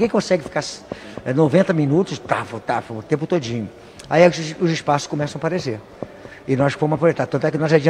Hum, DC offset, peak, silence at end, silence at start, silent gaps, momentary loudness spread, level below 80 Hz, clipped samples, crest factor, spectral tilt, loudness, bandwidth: none; under 0.1%; 0 dBFS; 0 s; 0 s; none; 17 LU; -54 dBFS; under 0.1%; 20 dB; -6.5 dB/octave; -20 LUFS; 10.5 kHz